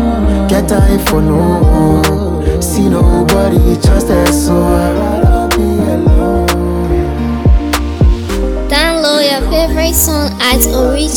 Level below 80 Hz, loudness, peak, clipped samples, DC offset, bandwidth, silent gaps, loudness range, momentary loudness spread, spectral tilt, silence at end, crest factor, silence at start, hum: -14 dBFS; -11 LUFS; 0 dBFS; under 0.1%; under 0.1%; 19.5 kHz; none; 2 LU; 4 LU; -5 dB/octave; 0 s; 10 dB; 0 s; none